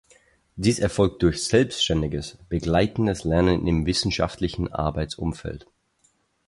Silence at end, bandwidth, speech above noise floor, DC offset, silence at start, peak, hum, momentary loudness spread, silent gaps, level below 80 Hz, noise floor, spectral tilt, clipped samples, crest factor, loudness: 0.9 s; 11.5 kHz; 43 dB; under 0.1%; 0.55 s; -6 dBFS; none; 9 LU; none; -38 dBFS; -66 dBFS; -5.5 dB/octave; under 0.1%; 18 dB; -23 LUFS